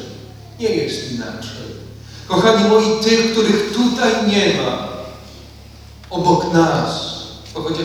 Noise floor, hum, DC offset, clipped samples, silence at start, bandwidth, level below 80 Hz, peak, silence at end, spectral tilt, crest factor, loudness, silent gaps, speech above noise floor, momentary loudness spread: -39 dBFS; none; under 0.1%; under 0.1%; 0 s; 16.5 kHz; -44 dBFS; 0 dBFS; 0 s; -5 dB/octave; 18 dB; -16 LUFS; none; 23 dB; 21 LU